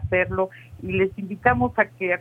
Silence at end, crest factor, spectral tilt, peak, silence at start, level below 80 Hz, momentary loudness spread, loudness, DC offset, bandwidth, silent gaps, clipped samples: 0 s; 20 dB; -8.5 dB/octave; -4 dBFS; 0 s; -46 dBFS; 8 LU; -23 LUFS; under 0.1%; 4 kHz; none; under 0.1%